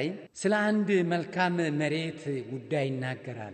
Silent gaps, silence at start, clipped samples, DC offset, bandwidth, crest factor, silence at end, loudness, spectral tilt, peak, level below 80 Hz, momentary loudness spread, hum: none; 0 s; under 0.1%; under 0.1%; 9 kHz; 18 dB; 0 s; -29 LUFS; -6 dB/octave; -12 dBFS; -76 dBFS; 10 LU; none